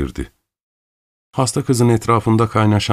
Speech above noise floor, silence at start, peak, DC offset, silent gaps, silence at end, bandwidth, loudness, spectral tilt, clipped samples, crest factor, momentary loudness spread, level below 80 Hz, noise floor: over 74 dB; 0 s; -2 dBFS; under 0.1%; 0.63-1.31 s; 0 s; 14 kHz; -16 LUFS; -6 dB/octave; under 0.1%; 16 dB; 14 LU; -38 dBFS; under -90 dBFS